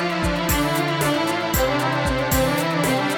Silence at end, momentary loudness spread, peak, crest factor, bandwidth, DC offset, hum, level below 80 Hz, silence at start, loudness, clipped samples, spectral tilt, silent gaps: 0 s; 2 LU; -6 dBFS; 14 dB; over 20 kHz; under 0.1%; none; -34 dBFS; 0 s; -21 LUFS; under 0.1%; -4.5 dB/octave; none